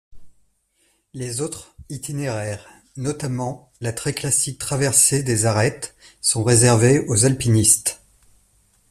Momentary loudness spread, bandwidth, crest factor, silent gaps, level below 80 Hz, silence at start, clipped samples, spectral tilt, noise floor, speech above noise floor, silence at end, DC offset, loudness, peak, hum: 18 LU; 14.5 kHz; 20 dB; none; -50 dBFS; 0.15 s; under 0.1%; -4 dB/octave; -65 dBFS; 45 dB; 0.95 s; under 0.1%; -19 LUFS; -2 dBFS; none